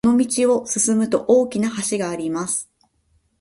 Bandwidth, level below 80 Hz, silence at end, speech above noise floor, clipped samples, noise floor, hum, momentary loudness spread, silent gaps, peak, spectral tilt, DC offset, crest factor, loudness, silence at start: 11.5 kHz; -58 dBFS; 0.75 s; 44 dB; under 0.1%; -64 dBFS; none; 7 LU; none; -4 dBFS; -4 dB/octave; under 0.1%; 16 dB; -20 LUFS; 0.05 s